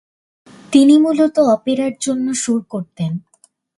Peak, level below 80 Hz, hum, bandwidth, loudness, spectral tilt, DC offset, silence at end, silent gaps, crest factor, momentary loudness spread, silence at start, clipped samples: 0 dBFS; -62 dBFS; none; 11.5 kHz; -15 LUFS; -5.5 dB/octave; under 0.1%; 0.6 s; none; 16 dB; 13 LU; 0.7 s; under 0.1%